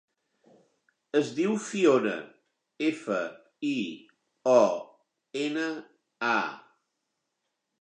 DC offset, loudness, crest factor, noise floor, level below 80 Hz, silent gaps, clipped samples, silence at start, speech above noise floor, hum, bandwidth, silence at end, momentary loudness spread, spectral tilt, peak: under 0.1%; -28 LUFS; 22 dB; -82 dBFS; -86 dBFS; none; under 0.1%; 1.15 s; 55 dB; none; 9.8 kHz; 1.2 s; 15 LU; -5 dB/octave; -8 dBFS